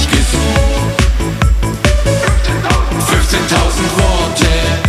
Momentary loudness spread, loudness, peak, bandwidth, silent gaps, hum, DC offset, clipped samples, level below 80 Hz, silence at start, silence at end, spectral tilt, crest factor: 2 LU; -13 LUFS; 0 dBFS; 15 kHz; none; none; under 0.1%; under 0.1%; -14 dBFS; 0 s; 0 s; -4.5 dB/octave; 12 dB